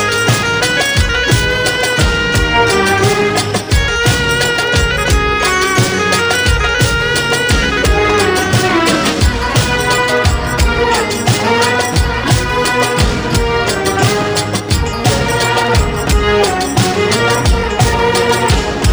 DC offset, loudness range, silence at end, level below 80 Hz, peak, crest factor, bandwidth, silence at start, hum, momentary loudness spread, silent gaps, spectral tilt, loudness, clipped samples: under 0.1%; 2 LU; 0 s; -22 dBFS; 0 dBFS; 12 dB; over 20 kHz; 0 s; none; 3 LU; none; -4 dB/octave; -12 LUFS; under 0.1%